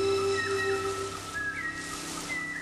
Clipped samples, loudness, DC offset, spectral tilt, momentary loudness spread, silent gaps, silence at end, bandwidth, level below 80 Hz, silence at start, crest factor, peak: under 0.1%; -31 LUFS; under 0.1%; -3 dB/octave; 7 LU; none; 0 s; 14.5 kHz; -56 dBFS; 0 s; 14 dB; -18 dBFS